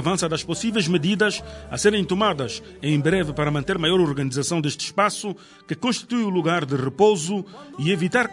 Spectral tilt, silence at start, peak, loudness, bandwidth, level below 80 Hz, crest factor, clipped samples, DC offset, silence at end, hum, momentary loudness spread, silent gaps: -4.5 dB/octave; 0 s; -4 dBFS; -22 LUFS; 11 kHz; -50 dBFS; 18 dB; under 0.1%; under 0.1%; 0 s; none; 10 LU; none